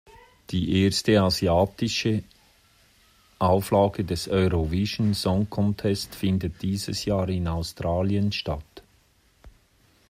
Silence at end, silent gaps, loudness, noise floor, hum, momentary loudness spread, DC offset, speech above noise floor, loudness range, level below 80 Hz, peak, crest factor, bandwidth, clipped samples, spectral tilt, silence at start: 0.6 s; none; -25 LUFS; -62 dBFS; none; 8 LU; under 0.1%; 38 dB; 4 LU; -46 dBFS; -8 dBFS; 18 dB; 15.5 kHz; under 0.1%; -6 dB/octave; 0.5 s